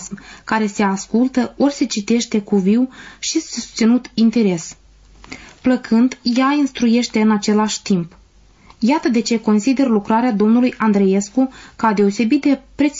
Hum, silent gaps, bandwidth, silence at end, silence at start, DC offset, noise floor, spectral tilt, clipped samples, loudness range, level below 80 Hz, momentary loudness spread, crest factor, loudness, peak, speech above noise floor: none; none; 7.8 kHz; 0 s; 0 s; under 0.1%; -49 dBFS; -5 dB/octave; under 0.1%; 2 LU; -52 dBFS; 7 LU; 10 dB; -17 LUFS; -6 dBFS; 32 dB